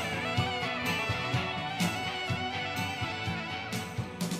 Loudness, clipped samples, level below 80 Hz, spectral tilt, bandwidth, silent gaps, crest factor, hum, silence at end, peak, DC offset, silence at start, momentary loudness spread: -32 LUFS; under 0.1%; -56 dBFS; -4.5 dB/octave; 15.5 kHz; none; 18 dB; none; 0 s; -16 dBFS; under 0.1%; 0 s; 5 LU